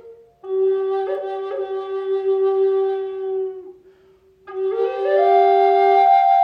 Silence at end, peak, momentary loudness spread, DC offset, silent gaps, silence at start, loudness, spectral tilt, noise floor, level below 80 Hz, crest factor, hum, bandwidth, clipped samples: 0 s; -4 dBFS; 12 LU; under 0.1%; none; 0.05 s; -19 LUFS; -5 dB/octave; -53 dBFS; -70 dBFS; 14 dB; none; 5.2 kHz; under 0.1%